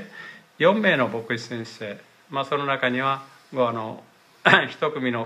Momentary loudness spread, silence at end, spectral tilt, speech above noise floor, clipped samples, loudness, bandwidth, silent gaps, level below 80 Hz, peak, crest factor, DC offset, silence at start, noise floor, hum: 19 LU; 0 s; -5.5 dB/octave; 20 dB; under 0.1%; -23 LUFS; 13.5 kHz; none; -72 dBFS; 0 dBFS; 24 dB; under 0.1%; 0 s; -43 dBFS; none